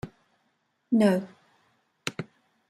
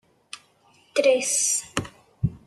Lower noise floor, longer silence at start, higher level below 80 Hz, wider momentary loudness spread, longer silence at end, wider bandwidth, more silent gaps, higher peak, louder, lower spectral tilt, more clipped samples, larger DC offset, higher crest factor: first, -73 dBFS vs -60 dBFS; second, 0.05 s vs 0.35 s; second, -66 dBFS vs -50 dBFS; about the same, 23 LU vs 22 LU; first, 0.45 s vs 0.1 s; about the same, 12.5 kHz vs 13 kHz; neither; second, -8 dBFS vs -4 dBFS; second, -27 LUFS vs -23 LUFS; first, -6.5 dB/octave vs -3 dB/octave; neither; neither; about the same, 22 dB vs 22 dB